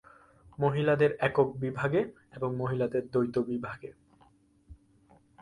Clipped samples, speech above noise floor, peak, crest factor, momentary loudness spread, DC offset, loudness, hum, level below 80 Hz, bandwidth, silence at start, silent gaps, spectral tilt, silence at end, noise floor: under 0.1%; 34 dB; -12 dBFS; 20 dB; 12 LU; under 0.1%; -30 LUFS; none; -62 dBFS; 10.5 kHz; 0.6 s; none; -8.5 dB/octave; 0.65 s; -63 dBFS